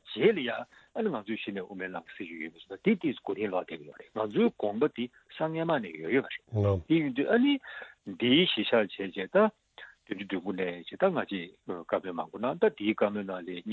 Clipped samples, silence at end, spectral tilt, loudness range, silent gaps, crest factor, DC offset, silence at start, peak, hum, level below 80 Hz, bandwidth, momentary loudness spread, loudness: under 0.1%; 0 s; -8 dB/octave; 6 LU; none; 20 dB; under 0.1%; 0.05 s; -10 dBFS; none; -58 dBFS; 7 kHz; 15 LU; -30 LUFS